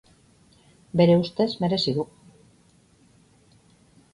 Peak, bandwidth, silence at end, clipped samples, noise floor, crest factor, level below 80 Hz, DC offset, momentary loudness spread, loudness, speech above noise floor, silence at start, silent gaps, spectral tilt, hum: -6 dBFS; 11 kHz; 2.1 s; under 0.1%; -59 dBFS; 20 dB; -60 dBFS; under 0.1%; 11 LU; -23 LUFS; 37 dB; 0.95 s; none; -7.5 dB/octave; none